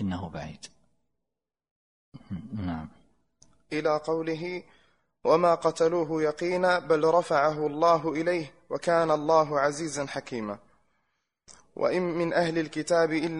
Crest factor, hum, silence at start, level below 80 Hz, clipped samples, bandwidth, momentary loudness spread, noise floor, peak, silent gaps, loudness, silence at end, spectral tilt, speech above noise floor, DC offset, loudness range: 20 dB; none; 0 s; -62 dBFS; under 0.1%; 10.5 kHz; 15 LU; -87 dBFS; -8 dBFS; 1.71-2.12 s; -26 LUFS; 0 s; -5.5 dB/octave; 61 dB; under 0.1%; 11 LU